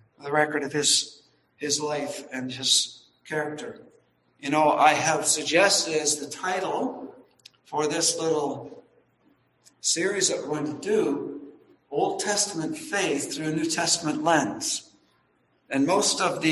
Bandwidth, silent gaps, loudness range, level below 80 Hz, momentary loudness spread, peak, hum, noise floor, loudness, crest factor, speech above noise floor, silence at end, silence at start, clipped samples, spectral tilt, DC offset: 12.5 kHz; none; 5 LU; -70 dBFS; 13 LU; -4 dBFS; none; -67 dBFS; -24 LUFS; 22 dB; 42 dB; 0 s; 0.2 s; under 0.1%; -2 dB/octave; under 0.1%